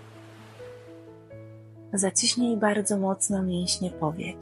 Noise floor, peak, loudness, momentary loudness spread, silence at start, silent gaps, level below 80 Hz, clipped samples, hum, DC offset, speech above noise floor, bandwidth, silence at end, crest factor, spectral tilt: -47 dBFS; -10 dBFS; -25 LUFS; 24 LU; 0 s; none; -58 dBFS; under 0.1%; none; under 0.1%; 21 dB; 14 kHz; 0 s; 18 dB; -3.5 dB/octave